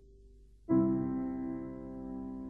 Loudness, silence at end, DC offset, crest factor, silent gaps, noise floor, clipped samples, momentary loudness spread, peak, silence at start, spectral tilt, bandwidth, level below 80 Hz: -35 LUFS; 0 s; under 0.1%; 16 dB; none; -58 dBFS; under 0.1%; 14 LU; -18 dBFS; 0 s; -12 dB/octave; 2.3 kHz; -56 dBFS